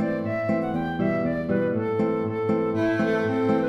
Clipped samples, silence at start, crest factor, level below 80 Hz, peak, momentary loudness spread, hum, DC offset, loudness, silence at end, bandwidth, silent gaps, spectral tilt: under 0.1%; 0 s; 12 dB; -54 dBFS; -12 dBFS; 3 LU; none; under 0.1%; -25 LUFS; 0 s; 8.4 kHz; none; -8.5 dB/octave